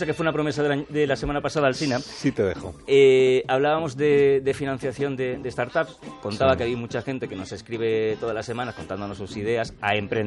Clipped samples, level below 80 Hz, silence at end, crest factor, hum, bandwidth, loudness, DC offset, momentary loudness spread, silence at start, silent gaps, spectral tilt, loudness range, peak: under 0.1%; -50 dBFS; 0 s; 16 dB; none; 11.5 kHz; -24 LUFS; under 0.1%; 13 LU; 0 s; none; -6 dB/octave; 6 LU; -6 dBFS